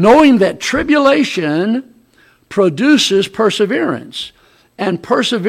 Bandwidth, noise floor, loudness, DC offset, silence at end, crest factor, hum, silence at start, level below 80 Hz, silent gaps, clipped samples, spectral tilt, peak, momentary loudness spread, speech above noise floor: 14.5 kHz; -51 dBFS; -13 LUFS; under 0.1%; 0 s; 12 dB; none; 0 s; -46 dBFS; none; under 0.1%; -4.5 dB/octave; 0 dBFS; 11 LU; 38 dB